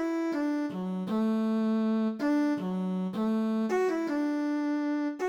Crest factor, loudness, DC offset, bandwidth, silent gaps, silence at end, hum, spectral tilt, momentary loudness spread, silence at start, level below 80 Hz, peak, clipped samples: 10 dB; -29 LUFS; under 0.1%; 11.5 kHz; none; 0 s; none; -7.5 dB/octave; 4 LU; 0 s; -74 dBFS; -18 dBFS; under 0.1%